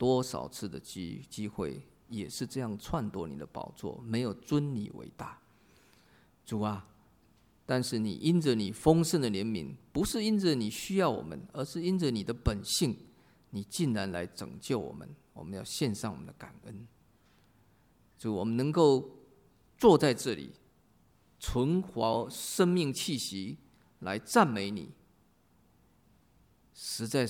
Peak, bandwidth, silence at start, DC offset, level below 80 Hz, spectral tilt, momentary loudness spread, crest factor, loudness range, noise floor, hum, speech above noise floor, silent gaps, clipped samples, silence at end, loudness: -10 dBFS; 18 kHz; 0 s; under 0.1%; -54 dBFS; -5.5 dB/octave; 18 LU; 22 dB; 9 LU; -67 dBFS; none; 36 dB; none; under 0.1%; 0 s; -32 LUFS